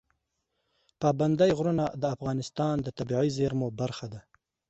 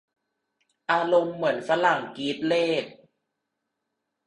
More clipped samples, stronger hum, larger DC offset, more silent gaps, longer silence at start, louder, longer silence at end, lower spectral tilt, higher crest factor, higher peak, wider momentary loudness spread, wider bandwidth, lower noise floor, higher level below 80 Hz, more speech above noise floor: neither; neither; neither; neither; about the same, 1 s vs 0.9 s; second, -28 LUFS vs -25 LUFS; second, 0.5 s vs 1.35 s; first, -7 dB/octave vs -5 dB/octave; about the same, 18 dB vs 20 dB; second, -12 dBFS vs -8 dBFS; about the same, 10 LU vs 9 LU; second, 8.2 kHz vs 10.5 kHz; about the same, -80 dBFS vs -82 dBFS; first, -58 dBFS vs -72 dBFS; second, 52 dB vs 57 dB